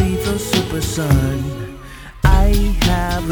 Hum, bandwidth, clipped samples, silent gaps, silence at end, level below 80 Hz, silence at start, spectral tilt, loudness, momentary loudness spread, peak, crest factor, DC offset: none; over 20 kHz; under 0.1%; none; 0 s; -20 dBFS; 0 s; -5.5 dB/octave; -18 LUFS; 15 LU; 0 dBFS; 16 dB; under 0.1%